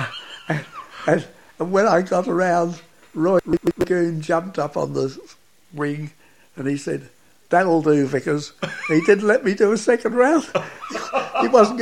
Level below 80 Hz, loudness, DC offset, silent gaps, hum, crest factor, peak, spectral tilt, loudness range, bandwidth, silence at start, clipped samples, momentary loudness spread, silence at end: -56 dBFS; -20 LUFS; 0.2%; none; none; 20 dB; 0 dBFS; -6 dB/octave; 6 LU; 15 kHz; 0 s; under 0.1%; 13 LU; 0 s